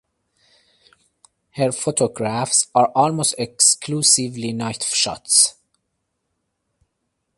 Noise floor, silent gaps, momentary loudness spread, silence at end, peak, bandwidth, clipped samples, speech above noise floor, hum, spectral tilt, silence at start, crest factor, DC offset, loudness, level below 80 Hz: -75 dBFS; none; 10 LU; 1.85 s; 0 dBFS; 12 kHz; under 0.1%; 56 dB; none; -2.5 dB/octave; 1.55 s; 22 dB; under 0.1%; -17 LUFS; -62 dBFS